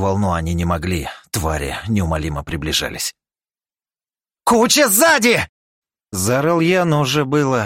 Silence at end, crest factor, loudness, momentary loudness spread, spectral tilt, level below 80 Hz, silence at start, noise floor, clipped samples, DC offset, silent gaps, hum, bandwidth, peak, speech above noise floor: 0 s; 16 dB; -17 LUFS; 13 LU; -4 dB/octave; -38 dBFS; 0 s; under -90 dBFS; under 0.1%; under 0.1%; 5.49-5.82 s; none; 16.5 kHz; -2 dBFS; over 73 dB